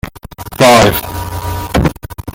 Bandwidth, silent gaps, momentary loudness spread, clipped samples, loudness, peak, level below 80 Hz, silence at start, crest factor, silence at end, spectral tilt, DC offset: 17.5 kHz; none; 22 LU; under 0.1%; -11 LUFS; 0 dBFS; -28 dBFS; 0.05 s; 12 dB; 0 s; -4.5 dB/octave; under 0.1%